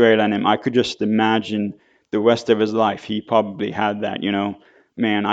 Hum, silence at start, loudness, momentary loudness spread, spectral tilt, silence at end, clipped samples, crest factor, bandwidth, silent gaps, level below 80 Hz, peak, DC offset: none; 0 s; -20 LUFS; 9 LU; -6 dB/octave; 0 s; under 0.1%; 18 dB; 8 kHz; none; -64 dBFS; -2 dBFS; under 0.1%